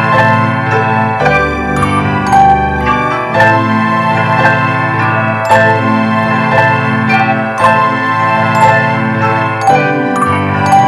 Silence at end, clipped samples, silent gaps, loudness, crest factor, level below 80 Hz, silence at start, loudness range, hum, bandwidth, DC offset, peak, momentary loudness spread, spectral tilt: 0 s; 0.7%; none; -10 LUFS; 10 dB; -34 dBFS; 0 s; 0 LU; none; 13.5 kHz; under 0.1%; 0 dBFS; 4 LU; -6.5 dB/octave